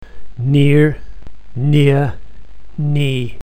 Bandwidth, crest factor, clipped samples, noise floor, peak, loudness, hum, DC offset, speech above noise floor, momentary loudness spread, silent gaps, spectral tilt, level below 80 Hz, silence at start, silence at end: 9.2 kHz; 16 dB; under 0.1%; -37 dBFS; 0 dBFS; -15 LUFS; none; 7%; 24 dB; 16 LU; none; -8 dB/octave; -38 dBFS; 0 s; 0 s